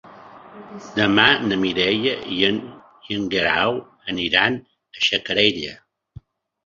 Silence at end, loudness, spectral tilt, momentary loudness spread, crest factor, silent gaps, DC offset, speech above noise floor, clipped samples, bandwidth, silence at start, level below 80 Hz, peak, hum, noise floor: 0.9 s; -19 LUFS; -4.5 dB/octave; 15 LU; 22 dB; none; under 0.1%; 25 dB; under 0.1%; 7.4 kHz; 0.05 s; -54 dBFS; 0 dBFS; none; -45 dBFS